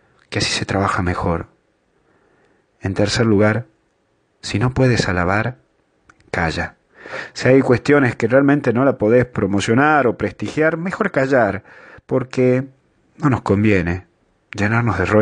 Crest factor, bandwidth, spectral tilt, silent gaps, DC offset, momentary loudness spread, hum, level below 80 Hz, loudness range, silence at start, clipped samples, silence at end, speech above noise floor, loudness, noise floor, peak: 18 dB; 10 kHz; -6 dB/octave; none; under 0.1%; 12 LU; none; -44 dBFS; 5 LU; 0.3 s; under 0.1%; 0 s; 47 dB; -17 LUFS; -63 dBFS; 0 dBFS